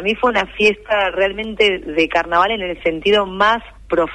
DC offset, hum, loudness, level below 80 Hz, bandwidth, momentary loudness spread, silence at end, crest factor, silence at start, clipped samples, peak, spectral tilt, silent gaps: under 0.1%; none; -17 LUFS; -42 dBFS; 10.5 kHz; 5 LU; 0 s; 14 dB; 0 s; under 0.1%; -2 dBFS; -4.5 dB/octave; none